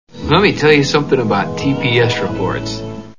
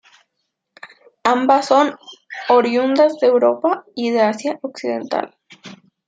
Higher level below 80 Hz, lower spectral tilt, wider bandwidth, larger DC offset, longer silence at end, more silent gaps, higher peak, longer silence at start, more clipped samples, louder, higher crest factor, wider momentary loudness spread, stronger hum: first, -38 dBFS vs -72 dBFS; about the same, -5.5 dB/octave vs -4.5 dB/octave; second, 7.4 kHz vs 9.2 kHz; first, 1% vs under 0.1%; second, 0.05 s vs 0.35 s; neither; about the same, 0 dBFS vs -2 dBFS; second, 0.15 s vs 0.85 s; neither; first, -14 LUFS vs -17 LUFS; about the same, 14 dB vs 16 dB; about the same, 9 LU vs 11 LU; neither